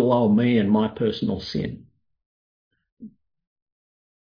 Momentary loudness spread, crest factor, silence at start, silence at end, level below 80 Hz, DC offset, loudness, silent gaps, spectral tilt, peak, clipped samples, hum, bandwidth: 12 LU; 16 dB; 0 s; 1.2 s; -56 dBFS; under 0.1%; -22 LUFS; 2.26-2.71 s, 2.92-2.97 s; -8.5 dB/octave; -8 dBFS; under 0.1%; none; 5.2 kHz